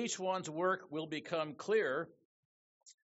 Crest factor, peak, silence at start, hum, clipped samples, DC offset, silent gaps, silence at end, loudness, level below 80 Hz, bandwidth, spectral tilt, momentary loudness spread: 16 dB; -22 dBFS; 0 s; none; under 0.1%; under 0.1%; 2.25-2.81 s; 0.15 s; -37 LUFS; -86 dBFS; 8 kHz; -3 dB/octave; 8 LU